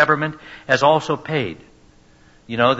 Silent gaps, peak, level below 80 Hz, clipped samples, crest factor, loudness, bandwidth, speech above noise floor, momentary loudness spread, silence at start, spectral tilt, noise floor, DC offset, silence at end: none; -2 dBFS; -56 dBFS; under 0.1%; 18 dB; -19 LUFS; 8 kHz; 31 dB; 16 LU; 0 s; -5.5 dB/octave; -51 dBFS; under 0.1%; 0 s